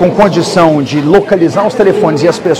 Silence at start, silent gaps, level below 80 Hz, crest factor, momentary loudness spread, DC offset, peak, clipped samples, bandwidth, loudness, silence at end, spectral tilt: 0 s; none; -40 dBFS; 8 dB; 2 LU; 0.6%; 0 dBFS; 3%; 14 kHz; -9 LUFS; 0 s; -6 dB/octave